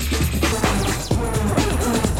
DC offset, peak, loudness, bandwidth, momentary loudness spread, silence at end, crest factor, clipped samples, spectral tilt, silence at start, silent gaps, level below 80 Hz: 0.7%; -4 dBFS; -20 LUFS; 16.5 kHz; 2 LU; 0 s; 16 dB; under 0.1%; -4.5 dB/octave; 0 s; none; -26 dBFS